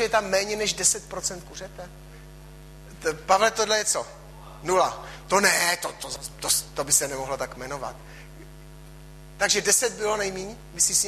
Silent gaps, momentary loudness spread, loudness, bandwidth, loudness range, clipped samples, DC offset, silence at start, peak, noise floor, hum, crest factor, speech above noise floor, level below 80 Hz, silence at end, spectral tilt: none; 19 LU; -24 LUFS; 14.5 kHz; 4 LU; under 0.1%; under 0.1%; 0 s; -6 dBFS; -44 dBFS; none; 20 dB; 19 dB; -48 dBFS; 0 s; -1 dB/octave